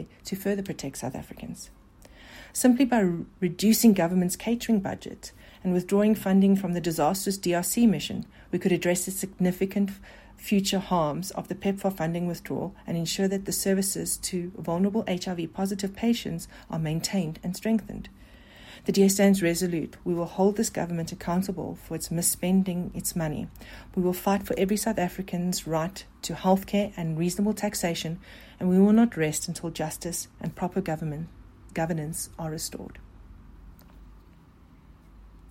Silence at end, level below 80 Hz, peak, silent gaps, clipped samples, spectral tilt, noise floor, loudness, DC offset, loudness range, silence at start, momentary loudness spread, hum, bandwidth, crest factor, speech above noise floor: 0.05 s; -52 dBFS; -8 dBFS; none; under 0.1%; -5 dB/octave; -53 dBFS; -27 LUFS; under 0.1%; 7 LU; 0 s; 14 LU; none; 16.5 kHz; 18 dB; 27 dB